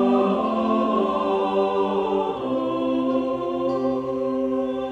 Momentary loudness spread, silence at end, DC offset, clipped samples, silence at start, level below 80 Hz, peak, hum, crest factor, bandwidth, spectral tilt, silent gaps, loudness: 4 LU; 0 s; under 0.1%; under 0.1%; 0 s; -56 dBFS; -8 dBFS; none; 14 dB; 7.8 kHz; -7.5 dB/octave; none; -23 LUFS